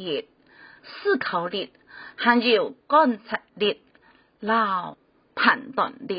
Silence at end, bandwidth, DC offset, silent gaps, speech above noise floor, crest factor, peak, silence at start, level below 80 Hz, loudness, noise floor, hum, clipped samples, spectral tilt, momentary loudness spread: 0 s; 5.2 kHz; under 0.1%; none; 35 dB; 20 dB; -4 dBFS; 0 s; -72 dBFS; -23 LUFS; -58 dBFS; none; under 0.1%; -8.5 dB/octave; 18 LU